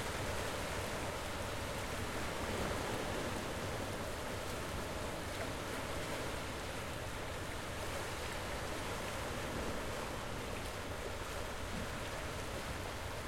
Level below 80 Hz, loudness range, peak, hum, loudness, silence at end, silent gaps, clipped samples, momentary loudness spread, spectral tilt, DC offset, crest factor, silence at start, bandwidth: -50 dBFS; 2 LU; -26 dBFS; none; -41 LUFS; 0 s; none; under 0.1%; 3 LU; -4 dB/octave; under 0.1%; 16 dB; 0 s; 16.5 kHz